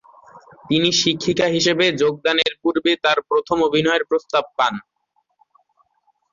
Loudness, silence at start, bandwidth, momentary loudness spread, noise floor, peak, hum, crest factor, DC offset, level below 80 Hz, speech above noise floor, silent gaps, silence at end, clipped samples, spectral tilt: -18 LUFS; 0.35 s; 7.6 kHz; 5 LU; -68 dBFS; -4 dBFS; none; 16 dB; under 0.1%; -58 dBFS; 49 dB; none; 1.5 s; under 0.1%; -3.5 dB/octave